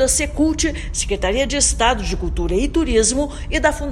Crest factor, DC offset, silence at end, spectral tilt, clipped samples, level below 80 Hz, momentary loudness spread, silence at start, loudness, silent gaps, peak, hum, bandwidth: 16 dB; under 0.1%; 0 s; -3.5 dB/octave; under 0.1%; -26 dBFS; 7 LU; 0 s; -18 LUFS; none; -2 dBFS; none; 13.5 kHz